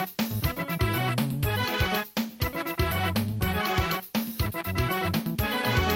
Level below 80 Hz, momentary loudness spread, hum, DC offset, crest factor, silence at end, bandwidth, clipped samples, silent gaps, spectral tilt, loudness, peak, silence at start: -38 dBFS; 4 LU; none; under 0.1%; 16 dB; 0 s; 17 kHz; under 0.1%; none; -5 dB/octave; -28 LUFS; -10 dBFS; 0 s